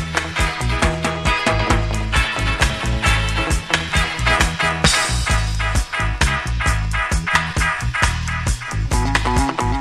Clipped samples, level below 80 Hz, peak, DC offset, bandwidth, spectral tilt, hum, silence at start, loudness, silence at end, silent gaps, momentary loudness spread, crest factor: under 0.1%; -24 dBFS; 0 dBFS; under 0.1%; 13.5 kHz; -3.5 dB/octave; none; 0 s; -19 LUFS; 0 s; none; 4 LU; 18 dB